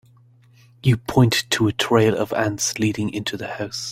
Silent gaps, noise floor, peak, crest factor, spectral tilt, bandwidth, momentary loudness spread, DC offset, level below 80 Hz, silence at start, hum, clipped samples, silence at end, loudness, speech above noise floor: none; -52 dBFS; -2 dBFS; 18 dB; -4.5 dB/octave; 16.5 kHz; 10 LU; under 0.1%; -50 dBFS; 0.85 s; none; under 0.1%; 0 s; -20 LUFS; 32 dB